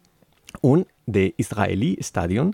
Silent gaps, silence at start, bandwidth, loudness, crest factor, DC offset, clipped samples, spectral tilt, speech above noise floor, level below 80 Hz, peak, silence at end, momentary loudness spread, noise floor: none; 0.55 s; 15.5 kHz; -22 LUFS; 16 dB; under 0.1%; under 0.1%; -7 dB/octave; 32 dB; -50 dBFS; -6 dBFS; 0 s; 5 LU; -52 dBFS